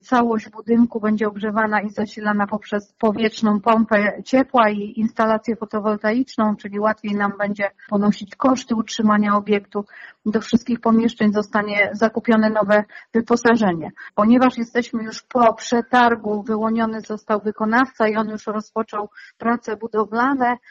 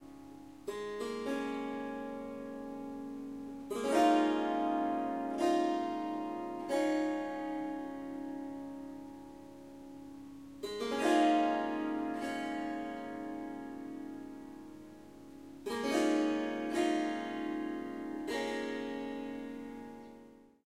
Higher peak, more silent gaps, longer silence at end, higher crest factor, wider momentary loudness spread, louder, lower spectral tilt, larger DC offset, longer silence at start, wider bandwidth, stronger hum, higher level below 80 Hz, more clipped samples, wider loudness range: first, -4 dBFS vs -16 dBFS; neither; about the same, 0.15 s vs 0.2 s; about the same, 16 dB vs 20 dB; second, 9 LU vs 20 LU; first, -20 LUFS vs -36 LUFS; about the same, -4.5 dB/octave vs -4.5 dB/octave; neither; about the same, 0.1 s vs 0 s; second, 7.6 kHz vs 15 kHz; second, none vs 50 Hz at -70 dBFS; first, -60 dBFS vs -70 dBFS; neither; second, 3 LU vs 9 LU